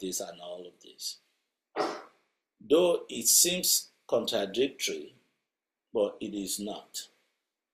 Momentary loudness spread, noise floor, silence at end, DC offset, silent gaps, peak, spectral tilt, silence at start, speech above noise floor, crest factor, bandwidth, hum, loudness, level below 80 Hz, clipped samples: 19 LU; -88 dBFS; 0.7 s; under 0.1%; none; -8 dBFS; -1.5 dB/octave; 0 s; 58 dB; 24 dB; 15.5 kHz; none; -28 LUFS; -74 dBFS; under 0.1%